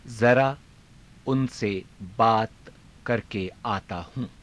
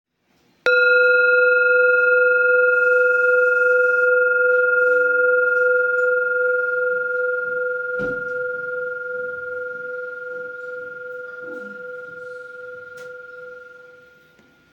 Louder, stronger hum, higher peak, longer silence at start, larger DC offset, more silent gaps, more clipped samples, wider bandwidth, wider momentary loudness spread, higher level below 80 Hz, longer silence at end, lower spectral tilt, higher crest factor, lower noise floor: second, -26 LUFS vs -17 LUFS; neither; second, -8 dBFS vs -4 dBFS; second, 0.05 s vs 0.65 s; neither; neither; neither; first, 11 kHz vs 6.2 kHz; second, 16 LU vs 20 LU; first, -54 dBFS vs -66 dBFS; second, 0.15 s vs 0.9 s; first, -6.5 dB/octave vs -4 dB/octave; about the same, 18 dB vs 14 dB; second, -52 dBFS vs -62 dBFS